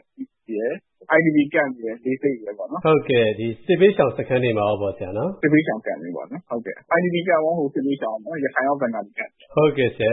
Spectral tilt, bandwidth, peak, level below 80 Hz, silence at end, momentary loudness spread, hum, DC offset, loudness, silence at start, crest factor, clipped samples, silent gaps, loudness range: -11.5 dB/octave; 4 kHz; -4 dBFS; -60 dBFS; 0 s; 13 LU; none; under 0.1%; -21 LUFS; 0.2 s; 18 dB; under 0.1%; none; 3 LU